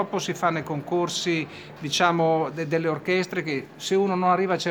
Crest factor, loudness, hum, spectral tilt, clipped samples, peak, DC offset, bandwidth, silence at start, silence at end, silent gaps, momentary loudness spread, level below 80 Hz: 20 dB; -24 LUFS; none; -4.5 dB/octave; under 0.1%; -6 dBFS; under 0.1%; over 20 kHz; 0 s; 0 s; none; 7 LU; -68 dBFS